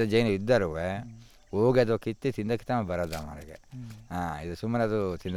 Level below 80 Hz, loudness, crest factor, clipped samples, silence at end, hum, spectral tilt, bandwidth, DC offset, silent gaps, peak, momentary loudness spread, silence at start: -54 dBFS; -29 LUFS; 18 dB; under 0.1%; 0 s; none; -7 dB/octave; 16 kHz; under 0.1%; none; -10 dBFS; 19 LU; 0 s